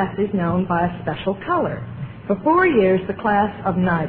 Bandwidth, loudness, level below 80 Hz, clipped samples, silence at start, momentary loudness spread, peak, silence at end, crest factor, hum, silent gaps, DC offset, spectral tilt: 4.7 kHz; -20 LUFS; -46 dBFS; under 0.1%; 0 s; 10 LU; -6 dBFS; 0 s; 14 dB; none; none; under 0.1%; -11.5 dB/octave